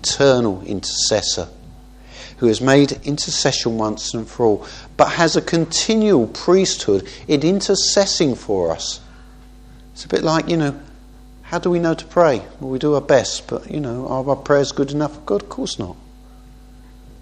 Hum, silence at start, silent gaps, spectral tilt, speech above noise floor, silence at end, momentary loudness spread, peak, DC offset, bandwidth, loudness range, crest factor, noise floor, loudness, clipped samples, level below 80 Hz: none; 0 s; none; -4 dB/octave; 24 dB; 0.05 s; 11 LU; 0 dBFS; under 0.1%; 10 kHz; 6 LU; 18 dB; -42 dBFS; -18 LUFS; under 0.1%; -42 dBFS